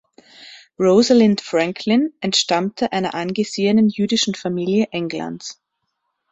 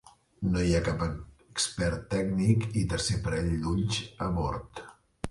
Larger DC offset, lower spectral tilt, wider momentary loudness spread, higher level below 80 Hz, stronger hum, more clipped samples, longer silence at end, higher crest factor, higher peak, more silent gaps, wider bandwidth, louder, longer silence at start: neither; about the same, -4.5 dB/octave vs -5.5 dB/octave; about the same, 11 LU vs 12 LU; second, -60 dBFS vs -42 dBFS; neither; neither; first, 0.8 s vs 0 s; about the same, 16 dB vs 18 dB; first, -2 dBFS vs -10 dBFS; neither; second, 8.2 kHz vs 11.5 kHz; first, -18 LUFS vs -30 LUFS; first, 0.4 s vs 0.05 s